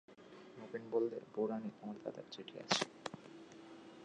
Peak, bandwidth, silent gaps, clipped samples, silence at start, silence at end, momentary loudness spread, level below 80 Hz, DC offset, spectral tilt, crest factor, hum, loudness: -18 dBFS; 10 kHz; none; under 0.1%; 0.1 s; 0 s; 19 LU; -86 dBFS; under 0.1%; -3.5 dB/octave; 26 dB; none; -42 LUFS